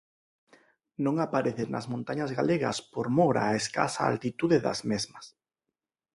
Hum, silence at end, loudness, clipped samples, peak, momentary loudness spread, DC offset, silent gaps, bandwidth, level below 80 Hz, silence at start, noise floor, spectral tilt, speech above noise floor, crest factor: none; 0.85 s; -29 LUFS; under 0.1%; -8 dBFS; 9 LU; under 0.1%; none; 11.5 kHz; -64 dBFS; 1 s; -88 dBFS; -5.5 dB/octave; 60 dB; 22 dB